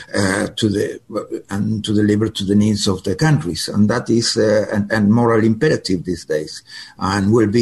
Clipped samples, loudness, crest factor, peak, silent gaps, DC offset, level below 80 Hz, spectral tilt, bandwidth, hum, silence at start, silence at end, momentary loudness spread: under 0.1%; -17 LUFS; 14 dB; -4 dBFS; none; 0.1%; -42 dBFS; -5.5 dB/octave; 12.5 kHz; none; 0 s; 0 s; 10 LU